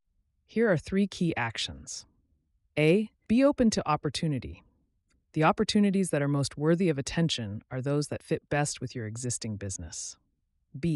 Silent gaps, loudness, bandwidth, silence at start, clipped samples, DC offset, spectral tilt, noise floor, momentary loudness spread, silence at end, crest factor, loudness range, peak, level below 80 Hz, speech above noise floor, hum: none; -29 LUFS; 12 kHz; 0.55 s; under 0.1%; under 0.1%; -5.5 dB/octave; -74 dBFS; 12 LU; 0 s; 16 dB; 4 LU; -12 dBFS; -54 dBFS; 46 dB; none